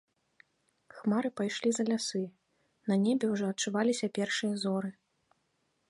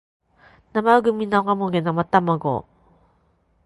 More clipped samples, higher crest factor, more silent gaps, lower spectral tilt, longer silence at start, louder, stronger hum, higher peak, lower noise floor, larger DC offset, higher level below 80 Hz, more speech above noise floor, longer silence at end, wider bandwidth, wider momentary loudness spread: neither; second, 16 dB vs 22 dB; neither; second, -4.5 dB/octave vs -8 dB/octave; first, 0.95 s vs 0.75 s; second, -32 LUFS vs -20 LUFS; neither; second, -16 dBFS vs -2 dBFS; first, -77 dBFS vs -63 dBFS; neither; second, -78 dBFS vs -58 dBFS; about the same, 46 dB vs 43 dB; about the same, 1 s vs 1.05 s; about the same, 11.5 kHz vs 11.5 kHz; about the same, 8 LU vs 9 LU